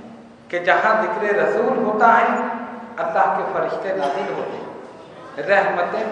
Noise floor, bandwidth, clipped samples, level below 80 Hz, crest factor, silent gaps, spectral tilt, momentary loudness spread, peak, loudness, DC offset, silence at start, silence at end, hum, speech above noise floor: -41 dBFS; 10.5 kHz; under 0.1%; -68 dBFS; 20 dB; none; -5.5 dB/octave; 17 LU; 0 dBFS; -19 LUFS; under 0.1%; 0 s; 0 s; none; 22 dB